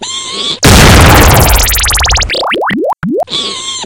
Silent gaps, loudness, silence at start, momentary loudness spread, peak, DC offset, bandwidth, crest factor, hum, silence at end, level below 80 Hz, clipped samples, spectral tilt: none; -7 LUFS; 0 s; 11 LU; 0 dBFS; under 0.1%; over 20 kHz; 8 dB; none; 0 s; -14 dBFS; 5%; -3.5 dB/octave